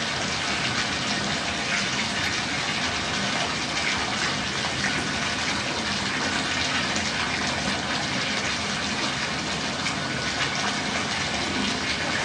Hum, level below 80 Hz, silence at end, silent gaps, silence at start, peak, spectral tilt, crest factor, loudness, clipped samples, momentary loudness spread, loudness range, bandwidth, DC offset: none; -50 dBFS; 0 s; none; 0 s; -10 dBFS; -2.5 dB/octave; 16 dB; -25 LUFS; under 0.1%; 2 LU; 1 LU; 12 kHz; under 0.1%